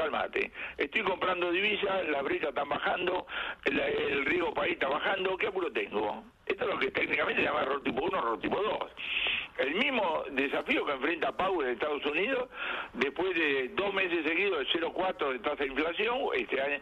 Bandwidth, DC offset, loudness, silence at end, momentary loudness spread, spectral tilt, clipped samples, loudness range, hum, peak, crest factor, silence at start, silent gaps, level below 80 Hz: 8.4 kHz; under 0.1%; -30 LUFS; 0 s; 5 LU; -5.5 dB/octave; under 0.1%; 1 LU; none; -14 dBFS; 18 dB; 0 s; none; -62 dBFS